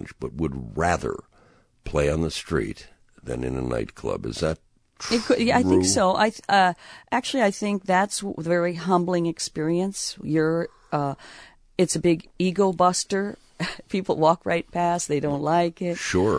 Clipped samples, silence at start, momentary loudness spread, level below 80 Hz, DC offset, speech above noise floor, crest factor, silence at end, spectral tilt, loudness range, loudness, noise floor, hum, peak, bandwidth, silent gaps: under 0.1%; 0 s; 12 LU; -46 dBFS; under 0.1%; 34 dB; 18 dB; 0 s; -4.5 dB/octave; 6 LU; -24 LUFS; -58 dBFS; none; -6 dBFS; 11 kHz; none